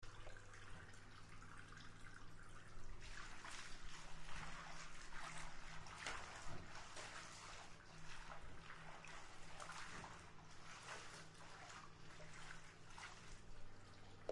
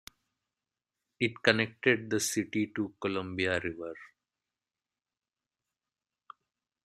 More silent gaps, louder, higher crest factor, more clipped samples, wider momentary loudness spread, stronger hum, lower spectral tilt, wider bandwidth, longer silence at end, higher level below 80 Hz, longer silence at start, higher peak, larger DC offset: neither; second, -57 LUFS vs -30 LUFS; second, 22 dB vs 30 dB; neither; second, 8 LU vs 11 LU; neither; about the same, -3 dB/octave vs -4 dB/octave; second, 11.5 kHz vs 14.5 kHz; second, 0 s vs 2.8 s; first, -62 dBFS vs -72 dBFS; second, 0 s vs 1.2 s; second, -30 dBFS vs -6 dBFS; neither